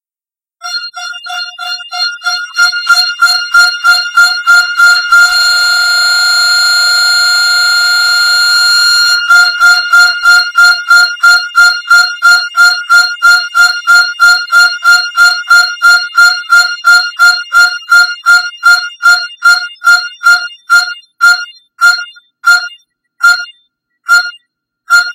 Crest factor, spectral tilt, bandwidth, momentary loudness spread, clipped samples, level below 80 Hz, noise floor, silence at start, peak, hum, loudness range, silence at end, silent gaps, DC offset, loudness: 8 dB; 5 dB/octave; 16.5 kHz; 9 LU; 2%; -52 dBFS; under -90 dBFS; 0.65 s; 0 dBFS; none; 5 LU; 0 s; none; under 0.1%; -6 LUFS